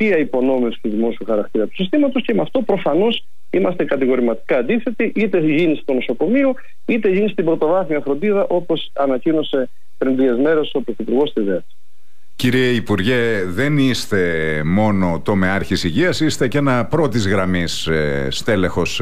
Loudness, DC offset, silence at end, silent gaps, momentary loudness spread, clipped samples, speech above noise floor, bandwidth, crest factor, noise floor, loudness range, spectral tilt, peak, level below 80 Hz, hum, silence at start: -18 LUFS; 5%; 0 s; none; 5 LU; under 0.1%; 45 dB; 15.5 kHz; 12 dB; -63 dBFS; 2 LU; -6 dB/octave; -6 dBFS; -46 dBFS; none; 0 s